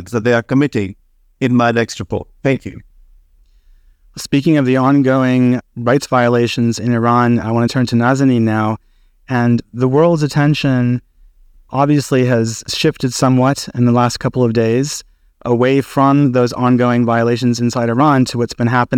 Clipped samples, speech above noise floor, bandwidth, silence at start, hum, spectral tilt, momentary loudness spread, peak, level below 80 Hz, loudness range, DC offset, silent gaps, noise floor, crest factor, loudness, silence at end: under 0.1%; 36 dB; 15 kHz; 0 s; none; -6.5 dB/octave; 8 LU; -2 dBFS; -46 dBFS; 4 LU; under 0.1%; none; -49 dBFS; 12 dB; -14 LUFS; 0 s